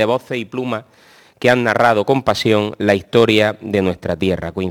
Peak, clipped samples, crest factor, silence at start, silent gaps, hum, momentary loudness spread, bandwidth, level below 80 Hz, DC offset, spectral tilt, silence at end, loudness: 0 dBFS; under 0.1%; 16 dB; 0 s; none; none; 10 LU; 19 kHz; -48 dBFS; under 0.1%; -6 dB/octave; 0 s; -16 LUFS